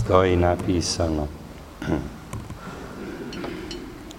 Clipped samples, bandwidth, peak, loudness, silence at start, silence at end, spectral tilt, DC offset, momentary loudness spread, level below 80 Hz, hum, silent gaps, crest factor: under 0.1%; 16 kHz; -2 dBFS; -26 LUFS; 0 s; 0 s; -5.5 dB/octave; under 0.1%; 17 LU; -40 dBFS; none; none; 24 dB